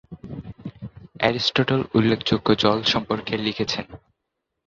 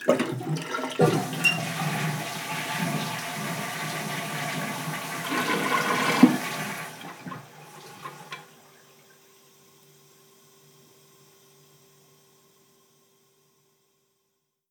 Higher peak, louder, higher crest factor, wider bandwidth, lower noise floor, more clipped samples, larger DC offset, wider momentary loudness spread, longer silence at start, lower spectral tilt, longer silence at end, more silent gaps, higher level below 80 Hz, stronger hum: about the same, -2 dBFS vs -2 dBFS; first, -21 LUFS vs -26 LUFS; second, 22 dB vs 28 dB; second, 7.6 kHz vs over 20 kHz; about the same, -80 dBFS vs -77 dBFS; neither; neither; about the same, 19 LU vs 19 LU; about the same, 0.1 s vs 0 s; about the same, -5.5 dB/octave vs -4.5 dB/octave; second, 0.7 s vs 6.25 s; neither; first, -50 dBFS vs -82 dBFS; neither